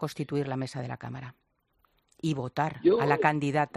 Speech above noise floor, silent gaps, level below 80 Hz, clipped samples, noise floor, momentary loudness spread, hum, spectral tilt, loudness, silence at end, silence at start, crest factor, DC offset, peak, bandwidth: 43 dB; none; -66 dBFS; under 0.1%; -71 dBFS; 15 LU; none; -7 dB/octave; -29 LUFS; 0.1 s; 0 s; 22 dB; under 0.1%; -8 dBFS; 13.5 kHz